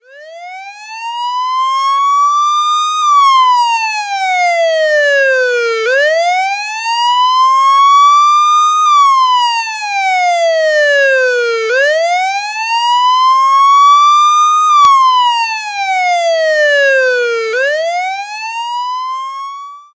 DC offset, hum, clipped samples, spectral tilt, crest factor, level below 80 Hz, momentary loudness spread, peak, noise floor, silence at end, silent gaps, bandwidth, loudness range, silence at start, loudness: under 0.1%; none; under 0.1%; 2.5 dB/octave; 10 dB; -66 dBFS; 12 LU; 0 dBFS; -31 dBFS; 0.15 s; none; 8 kHz; 4 LU; 0.15 s; -10 LUFS